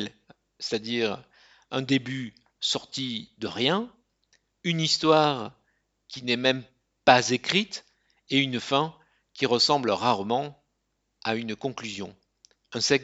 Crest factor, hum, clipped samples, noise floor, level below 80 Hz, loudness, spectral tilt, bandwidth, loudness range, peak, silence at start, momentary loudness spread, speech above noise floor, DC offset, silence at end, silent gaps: 26 dB; none; under 0.1%; -77 dBFS; -68 dBFS; -26 LUFS; -4 dB/octave; 9 kHz; 5 LU; 0 dBFS; 0 s; 16 LU; 51 dB; under 0.1%; 0 s; none